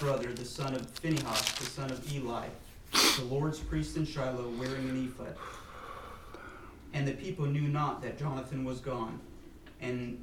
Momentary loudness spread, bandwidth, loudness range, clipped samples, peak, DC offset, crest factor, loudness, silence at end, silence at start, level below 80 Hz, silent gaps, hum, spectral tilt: 17 LU; 19.5 kHz; 7 LU; under 0.1%; -12 dBFS; under 0.1%; 24 dB; -34 LUFS; 0 s; 0 s; -52 dBFS; none; none; -4 dB/octave